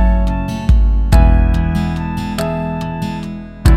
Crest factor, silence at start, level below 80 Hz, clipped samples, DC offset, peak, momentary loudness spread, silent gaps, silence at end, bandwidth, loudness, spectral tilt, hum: 12 dB; 0 s; -14 dBFS; under 0.1%; under 0.1%; 0 dBFS; 10 LU; none; 0 s; 12.5 kHz; -16 LUFS; -7.5 dB/octave; none